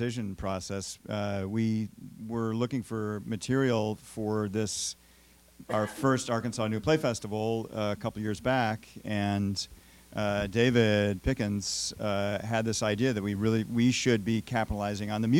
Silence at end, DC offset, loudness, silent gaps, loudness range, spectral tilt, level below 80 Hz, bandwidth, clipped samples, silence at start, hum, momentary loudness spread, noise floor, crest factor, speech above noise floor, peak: 0 s; under 0.1%; -30 LUFS; none; 3 LU; -5 dB/octave; -52 dBFS; 17 kHz; under 0.1%; 0 s; none; 9 LU; -59 dBFS; 20 dB; 29 dB; -10 dBFS